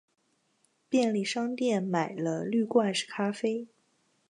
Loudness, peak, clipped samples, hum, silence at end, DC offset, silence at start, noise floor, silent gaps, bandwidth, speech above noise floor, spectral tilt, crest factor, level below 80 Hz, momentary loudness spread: -29 LUFS; -12 dBFS; under 0.1%; none; 0.65 s; under 0.1%; 0.9 s; -72 dBFS; none; 11 kHz; 44 dB; -5 dB/octave; 18 dB; -82 dBFS; 6 LU